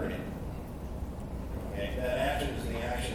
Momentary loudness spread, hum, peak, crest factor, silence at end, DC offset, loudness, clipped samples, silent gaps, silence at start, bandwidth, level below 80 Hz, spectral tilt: 10 LU; none; -20 dBFS; 16 dB; 0 s; under 0.1%; -35 LUFS; under 0.1%; none; 0 s; 18.5 kHz; -40 dBFS; -5.5 dB/octave